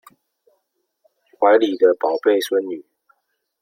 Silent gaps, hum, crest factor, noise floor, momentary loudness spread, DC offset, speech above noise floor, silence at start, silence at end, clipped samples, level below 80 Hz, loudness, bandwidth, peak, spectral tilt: none; none; 18 dB; -72 dBFS; 11 LU; under 0.1%; 55 dB; 1.4 s; 0.8 s; under 0.1%; -76 dBFS; -17 LUFS; 16 kHz; -2 dBFS; -3.5 dB/octave